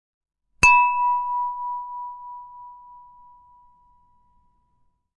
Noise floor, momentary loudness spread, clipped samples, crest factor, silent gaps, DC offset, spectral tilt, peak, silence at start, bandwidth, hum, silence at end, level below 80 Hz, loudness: -66 dBFS; 27 LU; under 0.1%; 22 dB; none; under 0.1%; -1.5 dB/octave; -2 dBFS; 0.6 s; 11.5 kHz; none; 2.2 s; -48 dBFS; -19 LUFS